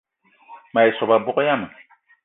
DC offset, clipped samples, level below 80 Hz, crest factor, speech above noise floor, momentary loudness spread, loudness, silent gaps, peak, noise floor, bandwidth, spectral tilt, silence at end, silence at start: under 0.1%; under 0.1%; -66 dBFS; 18 dB; 30 dB; 8 LU; -19 LUFS; none; -2 dBFS; -49 dBFS; 4 kHz; -10 dB/octave; 0.55 s; 0.5 s